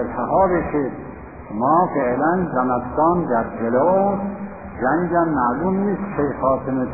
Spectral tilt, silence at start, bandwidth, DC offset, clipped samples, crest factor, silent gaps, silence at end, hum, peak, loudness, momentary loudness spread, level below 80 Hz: -3.5 dB/octave; 0 s; 2.6 kHz; 0.4%; under 0.1%; 14 dB; none; 0 s; none; -4 dBFS; -20 LUFS; 11 LU; -44 dBFS